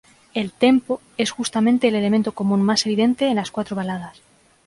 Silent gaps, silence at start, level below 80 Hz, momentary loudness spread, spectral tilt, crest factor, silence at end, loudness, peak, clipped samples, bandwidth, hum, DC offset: none; 0.35 s; -60 dBFS; 10 LU; -5 dB/octave; 16 dB; 0.55 s; -20 LUFS; -4 dBFS; under 0.1%; 11.5 kHz; none; under 0.1%